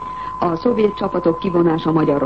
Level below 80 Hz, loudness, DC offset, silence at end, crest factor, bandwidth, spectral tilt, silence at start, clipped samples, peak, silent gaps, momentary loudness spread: -46 dBFS; -18 LUFS; 0.4%; 0 s; 14 dB; 6 kHz; -9 dB/octave; 0 s; under 0.1%; -2 dBFS; none; 5 LU